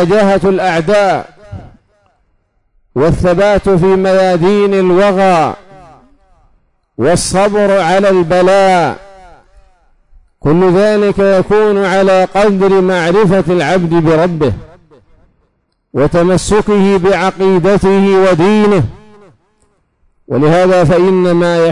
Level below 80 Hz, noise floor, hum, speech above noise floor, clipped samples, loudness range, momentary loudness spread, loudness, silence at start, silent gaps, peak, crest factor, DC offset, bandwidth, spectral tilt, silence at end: -34 dBFS; -60 dBFS; none; 51 dB; under 0.1%; 4 LU; 7 LU; -10 LUFS; 0 s; none; -2 dBFS; 8 dB; 2%; 11 kHz; -6.5 dB/octave; 0 s